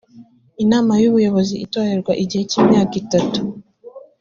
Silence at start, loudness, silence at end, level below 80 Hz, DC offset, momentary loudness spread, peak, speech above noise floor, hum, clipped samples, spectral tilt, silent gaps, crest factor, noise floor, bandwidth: 0.15 s; -17 LUFS; 0.2 s; -52 dBFS; under 0.1%; 8 LU; -2 dBFS; 29 dB; none; under 0.1%; -6 dB/octave; none; 16 dB; -45 dBFS; 7.4 kHz